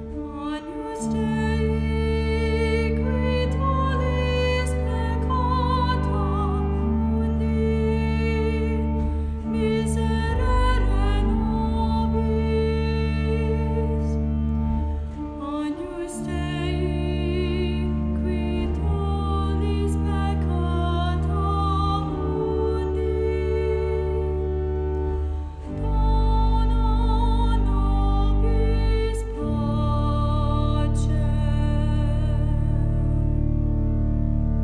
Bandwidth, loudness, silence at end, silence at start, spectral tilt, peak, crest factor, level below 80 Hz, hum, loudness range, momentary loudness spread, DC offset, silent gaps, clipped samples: 10.5 kHz; -24 LUFS; 0 s; 0 s; -7.5 dB/octave; -10 dBFS; 12 dB; -24 dBFS; none; 3 LU; 5 LU; under 0.1%; none; under 0.1%